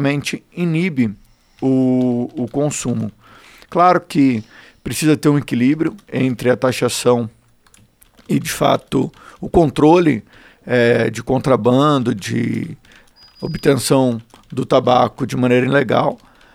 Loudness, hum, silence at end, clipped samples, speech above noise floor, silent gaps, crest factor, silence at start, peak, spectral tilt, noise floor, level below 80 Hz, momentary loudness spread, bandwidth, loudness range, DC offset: -17 LUFS; none; 0.4 s; under 0.1%; 36 dB; none; 16 dB; 0 s; 0 dBFS; -6 dB/octave; -52 dBFS; -44 dBFS; 11 LU; 16 kHz; 3 LU; under 0.1%